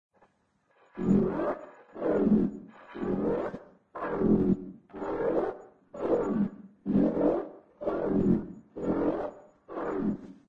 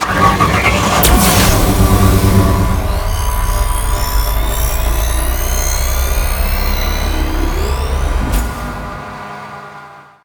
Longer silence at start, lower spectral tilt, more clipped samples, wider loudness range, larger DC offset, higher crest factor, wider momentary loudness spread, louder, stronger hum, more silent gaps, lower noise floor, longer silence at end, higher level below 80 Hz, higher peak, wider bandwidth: first, 0.95 s vs 0 s; first, -10.5 dB/octave vs -4.5 dB/octave; neither; second, 1 LU vs 7 LU; neither; about the same, 18 dB vs 14 dB; first, 18 LU vs 15 LU; second, -30 LUFS vs -14 LUFS; neither; neither; first, -71 dBFS vs -36 dBFS; about the same, 0.15 s vs 0.2 s; second, -54 dBFS vs -16 dBFS; second, -12 dBFS vs 0 dBFS; second, 7.2 kHz vs over 20 kHz